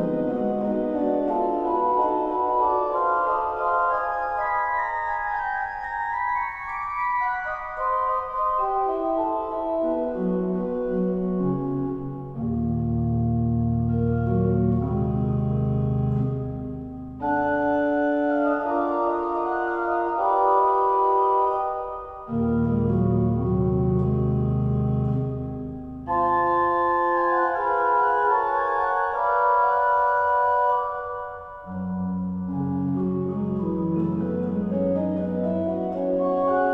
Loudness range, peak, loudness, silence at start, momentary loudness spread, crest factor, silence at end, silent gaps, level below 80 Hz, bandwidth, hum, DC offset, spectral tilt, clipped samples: 4 LU; -8 dBFS; -24 LUFS; 0 s; 8 LU; 16 dB; 0 s; none; -42 dBFS; 5.2 kHz; none; under 0.1%; -10.5 dB/octave; under 0.1%